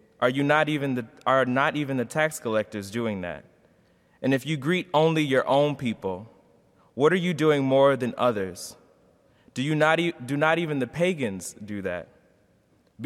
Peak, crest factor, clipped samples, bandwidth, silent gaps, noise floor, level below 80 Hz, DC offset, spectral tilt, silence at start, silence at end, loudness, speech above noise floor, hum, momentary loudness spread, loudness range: -6 dBFS; 20 dB; under 0.1%; 15.5 kHz; none; -63 dBFS; -66 dBFS; under 0.1%; -5.5 dB/octave; 0.2 s; 0 s; -25 LUFS; 39 dB; none; 12 LU; 3 LU